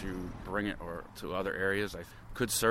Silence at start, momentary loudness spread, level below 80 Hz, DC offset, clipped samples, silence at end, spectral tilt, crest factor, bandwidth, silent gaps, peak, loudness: 0 s; 11 LU; -50 dBFS; under 0.1%; under 0.1%; 0 s; -3.5 dB/octave; 20 dB; 16.5 kHz; none; -14 dBFS; -35 LUFS